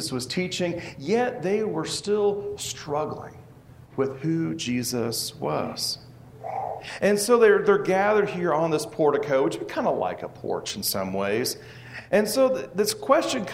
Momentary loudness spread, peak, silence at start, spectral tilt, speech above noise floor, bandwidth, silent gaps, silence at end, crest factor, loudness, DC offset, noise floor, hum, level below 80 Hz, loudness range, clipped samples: 12 LU; -6 dBFS; 0 s; -4 dB/octave; 24 dB; 16 kHz; none; 0 s; 20 dB; -25 LUFS; under 0.1%; -48 dBFS; none; -60 dBFS; 7 LU; under 0.1%